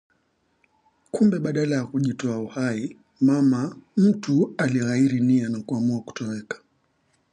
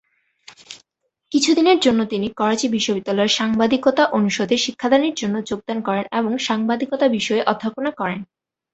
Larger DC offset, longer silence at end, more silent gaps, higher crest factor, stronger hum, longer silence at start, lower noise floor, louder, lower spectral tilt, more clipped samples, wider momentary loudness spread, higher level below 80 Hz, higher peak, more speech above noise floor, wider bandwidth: neither; first, 0.75 s vs 0.5 s; neither; about the same, 14 dB vs 18 dB; neither; first, 1.15 s vs 0.7 s; second, -69 dBFS vs -74 dBFS; second, -23 LUFS vs -19 LUFS; first, -7 dB/octave vs -4 dB/octave; neither; first, 12 LU vs 9 LU; second, -66 dBFS vs -58 dBFS; second, -8 dBFS vs -2 dBFS; second, 46 dB vs 55 dB; first, 10 kHz vs 8.2 kHz